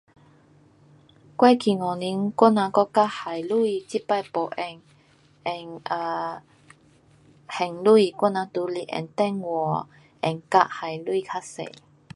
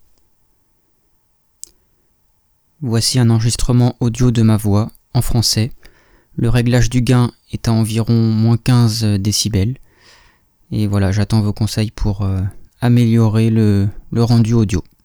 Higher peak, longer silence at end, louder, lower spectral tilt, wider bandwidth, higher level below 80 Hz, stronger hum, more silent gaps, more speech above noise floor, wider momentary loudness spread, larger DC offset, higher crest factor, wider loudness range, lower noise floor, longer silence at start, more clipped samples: about the same, -2 dBFS vs -2 dBFS; first, 0.45 s vs 0.2 s; second, -24 LUFS vs -15 LUFS; about the same, -6 dB/octave vs -6 dB/octave; second, 11.5 kHz vs 18.5 kHz; second, -72 dBFS vs -32 dBFS; neither; neither; second, 34 dB vs 46 dB; first, 16 LU vs 9 LU; neither; first, 22 dB vs 12 dB; first, 8 LU vs 4 LU; about the same, -58 dBFS vs -60 dBFS; second, 1.4 s vs 2.8 s; neither